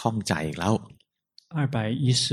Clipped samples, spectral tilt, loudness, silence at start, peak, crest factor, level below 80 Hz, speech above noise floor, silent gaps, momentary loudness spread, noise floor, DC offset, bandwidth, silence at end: under 0.1%; -5 dB/octave; -27 LUFS; 0 s; -6 dBFS; 20 dB; -56 dBFS; 35 dB; none; 6 LU; -60 dBFS; under 0.1%; 13.5 kHz; 0 s